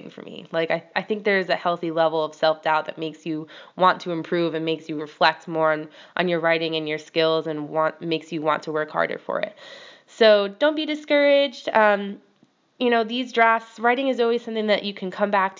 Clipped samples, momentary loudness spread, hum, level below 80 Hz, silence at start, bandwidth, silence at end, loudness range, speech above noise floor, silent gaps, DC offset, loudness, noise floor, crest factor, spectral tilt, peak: under 0.1%; 12 LU; none; -84 dBFS; 0.05 s; 7.6 kHz; 0.05 s; 3 LU; 39 dB; none; under 0.1%; -22 LUFS; -61 dBFS; 20 dB; -5.5 dB/octave; -2 dBFS